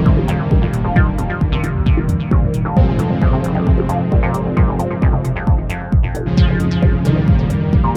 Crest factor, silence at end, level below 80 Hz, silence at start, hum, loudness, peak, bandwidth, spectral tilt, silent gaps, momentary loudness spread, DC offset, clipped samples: 14 dB; 0 s; -20 dBFS; 0 s; none; -16 LUFS; 0 dBFS; 12 kHz; -8.5 dB/octave; none; 3 LU; under 0.1%; under 0.1%